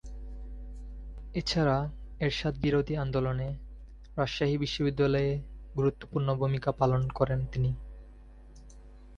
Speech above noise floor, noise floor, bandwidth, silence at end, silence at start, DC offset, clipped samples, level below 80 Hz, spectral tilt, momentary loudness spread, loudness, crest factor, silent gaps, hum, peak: 21 dB; -50 dBFS; 9 kHz; 0 s; 0.05 s; under 0.1%; under 0.1%; -44 dBFS; -7 dB/octave; 18 LU; -30 LUFS; 20 dB; none; none; -12 dBFS